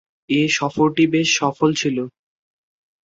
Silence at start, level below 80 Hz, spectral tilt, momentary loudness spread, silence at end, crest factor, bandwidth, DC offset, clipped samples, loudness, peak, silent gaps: 0.3 s; -58 dBFS; -4 dB/octave; 7 LU; 0.95 s; 18 dB; 7.8 kHz; under 0.1%; under 0.1%; -18 LUFS; -4 dBFS; none